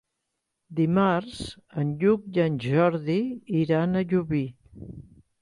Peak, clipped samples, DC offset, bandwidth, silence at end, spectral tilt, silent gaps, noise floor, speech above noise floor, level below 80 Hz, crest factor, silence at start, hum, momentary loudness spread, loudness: -10 dBFS; under 0.1%; under 0.1%; 11.5 kHz; 0.4 s; -8 dB/octave; none; -81 dBFS; 56 dB; -56 dBFS; 16 dB; 0.7 s; none; 15 LU; -25 LUFS